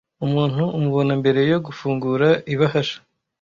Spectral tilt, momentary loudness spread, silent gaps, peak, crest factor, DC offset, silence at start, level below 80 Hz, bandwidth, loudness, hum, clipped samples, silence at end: -7.5 dB/octave; 6 LU; none; -4 dBFS; 16 dB; under 0.1%; 0.2 s; -56 dBFS; 7.2 kHz; -20 LUFS; none; under 0.1%; 0.45 s